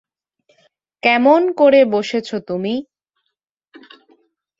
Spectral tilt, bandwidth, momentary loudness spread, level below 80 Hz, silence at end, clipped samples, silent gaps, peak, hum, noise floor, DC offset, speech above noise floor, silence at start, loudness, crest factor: -5.5 dB/octave; 7.6 kHz; 12 LU; -66 dBFS; 1.8 s; under 0.1%; none; -2 dBFS; none; -76 dBFS; under 0.1%; 62 dB; 1.05 s; -15 LUFS; 16 dB